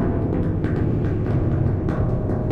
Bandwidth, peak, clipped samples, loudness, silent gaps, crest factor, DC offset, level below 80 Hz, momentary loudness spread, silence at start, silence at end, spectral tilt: 4.8 kHz; -8 dBFS; under 0.1%; -22 LUFS; none; 12 dB; under 0.1%; -30 dBFS; 1 LU; 0 s; 0 s; -11 dB/octave